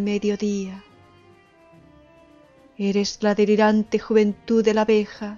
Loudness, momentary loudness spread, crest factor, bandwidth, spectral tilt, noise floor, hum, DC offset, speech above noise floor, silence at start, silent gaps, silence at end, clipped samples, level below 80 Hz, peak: -21 LUFS; 10 LU; 16 dB; 7.4 kHz; -6 dB/octave; -53 dBFS; none; under 0.1%; 32 dB; 0 s; none; 0 s; under 0.1%; -58 dBFS; -6 dBFS